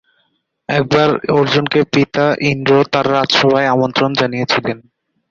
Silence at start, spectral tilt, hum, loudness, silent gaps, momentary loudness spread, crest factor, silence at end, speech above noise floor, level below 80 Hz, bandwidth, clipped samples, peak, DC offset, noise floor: 0.7 s; -5.5 dB/octave; none; -14 LUFS; none; 6 LU; 14 dB; 0.5 s; 50 dB; -52 dBFS; 7.4 kHz; under 0.1%; 0 dBFS; under 0.1%; -64 dBFS